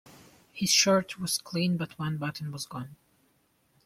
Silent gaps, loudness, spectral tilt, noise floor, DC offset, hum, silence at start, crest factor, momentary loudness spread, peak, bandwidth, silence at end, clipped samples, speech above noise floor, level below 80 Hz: none; -28 LUFS; -3.5 dB/octave; -69 dBFS; under 0.1%; none; 0.05 s; 22 dB; 18 LU; -8 dBFS; 16 kHz; 0.9 s; under 0.1%; 41 dB; -68 dBFS